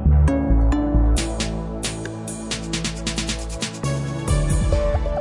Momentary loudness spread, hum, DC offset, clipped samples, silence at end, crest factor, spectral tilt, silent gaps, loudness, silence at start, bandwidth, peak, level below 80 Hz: 9 LU; none; under 0.1%; under 0.1%; 0 s; 14 dB; -5.5 dB/octave; none; -22 LUFS; 0 s; 11.5 kHz; -6 dBFS; -22 dBFS